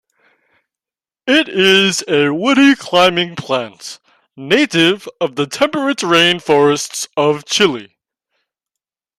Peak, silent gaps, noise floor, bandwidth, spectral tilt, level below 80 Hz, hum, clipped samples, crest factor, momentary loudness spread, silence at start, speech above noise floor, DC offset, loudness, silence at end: 0 dBFS; none; under -90 dBFS; 15.5 kHz; -3.5 dB/octave; -60 dBFS; none; under 0.1%; 16 dB; 10 LU; 1.25 s; over 76 dB; under 0.1%; -13 LUFS; 1.35 s